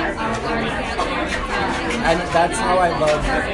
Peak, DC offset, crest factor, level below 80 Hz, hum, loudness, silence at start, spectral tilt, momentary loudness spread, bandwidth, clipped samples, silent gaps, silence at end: -4 dBFS; under 0.1%; 16 dB; -32 dBFS; none; -20 LUFS; 0 s; -4.5 dB/octave; 5 LU; 11.5 kHz; under 0.1%; none; 0 s